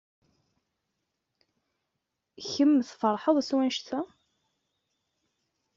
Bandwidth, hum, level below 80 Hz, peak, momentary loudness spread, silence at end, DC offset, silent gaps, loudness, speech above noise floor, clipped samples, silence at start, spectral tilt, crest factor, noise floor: 7.6 kHz; none; -78 dBFS; -10 dBFS; 13 LU; 1.7 s; under 0.1%; none; -27 LUFS; 57 dB; under 0.1%; 2.4 s; -3.5 dB/octave; 20 dB; -83 dBFS